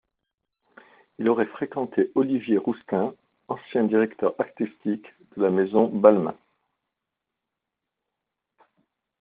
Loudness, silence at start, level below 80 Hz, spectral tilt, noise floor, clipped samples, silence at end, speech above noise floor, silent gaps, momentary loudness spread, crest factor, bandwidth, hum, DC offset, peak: -24 LUFS; 1.2 s; -72 dBFS; -7 dB/octave; -85 dBFS; under 0.1%; 2.9 s; 62 dB; none; 13 LU; 24 dB; 4.7 kHz; none; under 0.1%; -2 dBFS